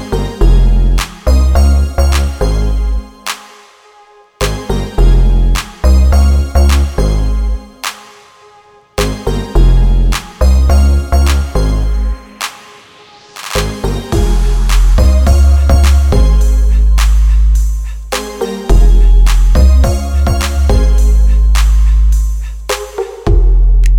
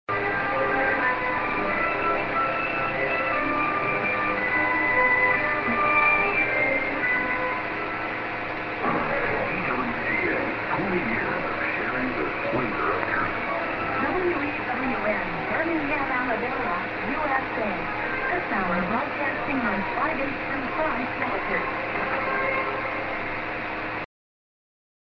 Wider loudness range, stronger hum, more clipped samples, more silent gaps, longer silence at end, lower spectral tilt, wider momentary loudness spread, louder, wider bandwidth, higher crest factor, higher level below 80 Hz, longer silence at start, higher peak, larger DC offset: about the same, 6 LU vs 5 LU; neither; neither; neither; second, 0 s vs 0.95 s; second, -5.5 dB/octave vs -7.5 dB/octave; first, 11 LU vs 7 LU; first, -12 LUFS vs -24 LUFS; first, 15 kHz vs 6.6 kHz; second, 8 dB vs 18 dB; first, -10 dBFS vs -50 dBFS; about the same, 0 s vs 0.1 s; first, 0 dBFS vs -8 dBFS; neither